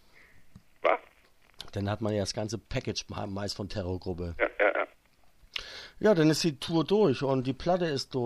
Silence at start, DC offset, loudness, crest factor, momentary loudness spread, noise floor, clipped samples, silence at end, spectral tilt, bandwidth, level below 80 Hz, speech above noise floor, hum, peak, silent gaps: 0.35 s; under 0.1%; -30 LUFS; 20 dB; 13 LU; -61 dBFS; under 0.1%; 0 s; -5.5 dB/octave; 14 kHz; -52 dBFS; 32 dB; none; -10 dBFS; none